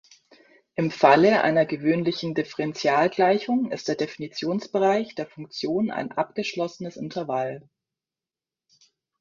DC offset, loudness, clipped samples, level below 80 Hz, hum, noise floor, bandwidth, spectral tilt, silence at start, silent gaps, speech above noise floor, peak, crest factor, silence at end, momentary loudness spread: under 0.1%; -24 LUFS; under 0.1%; -68 dBFS; none; under -90 dBFS; 7.4 kHz; -6 dB/octave; 0.8 s; none; over 66 dB; -2 dBFS; 22 dB; 1.6 s; 14 LU